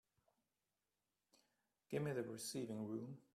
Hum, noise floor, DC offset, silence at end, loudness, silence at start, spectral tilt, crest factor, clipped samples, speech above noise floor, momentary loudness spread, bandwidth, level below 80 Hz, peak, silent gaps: 50 Hz at -85 dBFS; under -90 dBFS; under 0.1%; 0.15 s; -47 LUFS; 1.9 s; -5.5 dB/octave; 20 dB; under 0.1%; over 44 dB; 5 LU; 14.5 kHz; -84 dBFS; -30 dBFS; none